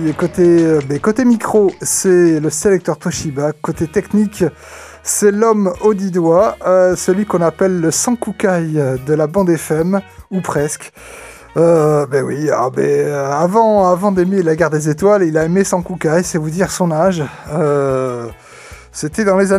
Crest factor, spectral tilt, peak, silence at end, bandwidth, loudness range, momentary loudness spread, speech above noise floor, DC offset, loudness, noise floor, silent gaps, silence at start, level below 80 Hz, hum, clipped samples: 14 dB; -5.5 dB/octave; 0 dBFS; 0 s; 15.5 kHz; 3 LU; 10 LU; 23 dB; under 0.1%; -14 LUFS; -37 dBFS; none; 0 s; -44 dBFS; none; under 0.1%